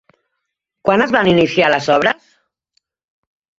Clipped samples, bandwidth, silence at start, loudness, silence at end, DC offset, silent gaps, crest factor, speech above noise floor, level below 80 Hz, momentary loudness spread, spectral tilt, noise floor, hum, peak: under 0.1%; 7.8 kHz; 0.85 s; -14 LUFS; 1.45 s; under 0.1%; none; 16 dB; 63 dB; -52 dBFS; 7 LU; -5.5 dB/octave; -76 dBFS; none; 0 dBFS